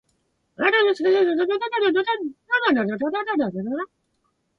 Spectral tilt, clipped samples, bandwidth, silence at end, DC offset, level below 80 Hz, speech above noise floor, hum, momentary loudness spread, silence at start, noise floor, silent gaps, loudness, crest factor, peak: -6 dB/octave; under 0.1%; 6.8 kHz; 0.75 s; under 0.1%; -68 dBFS; 49 dB; none; 10 LU; 0.6 s; -71 dBFS; none; -22 LUFS; 16 dB; -6 dBFS